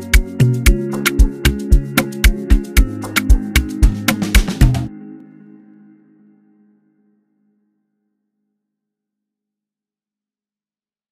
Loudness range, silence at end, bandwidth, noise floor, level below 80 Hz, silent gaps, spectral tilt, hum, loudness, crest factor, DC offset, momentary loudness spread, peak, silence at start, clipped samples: 6 LU; 5.95 s; 15.5 kHz; under -90 dBFS; -18 dBFS; none; -5 dB/octave; none; -16 LUFS; 16 dB; under 0.1%; 5 LU; 0 dBFS; 0 s; under 0.1%